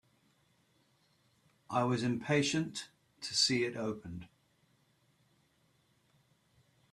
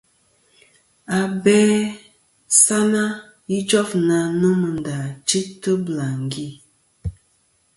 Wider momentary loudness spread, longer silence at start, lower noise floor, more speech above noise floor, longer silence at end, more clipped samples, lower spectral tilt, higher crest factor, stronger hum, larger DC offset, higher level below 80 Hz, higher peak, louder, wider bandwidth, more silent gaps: about the same, 17 LU vs 19 LU; first, 1.7 s vs 1.1 s; first, -73 dBFS vs -63 dBFS; second, 39 dB vs 44 dB; first, 2.65 s vs 0.65 s; neither; about the same, -4 dB/octave vs -4 dB/octave; about the same, 22 dB vs 20 dB; neither; neither; second, -72 dBFS vs -48 dBFS; second, -16 dBFS vs 0 dBFS; second, -33 LUFS vs -19 LUFS; first, 13.5 kHz vs 11.5 kHz; neither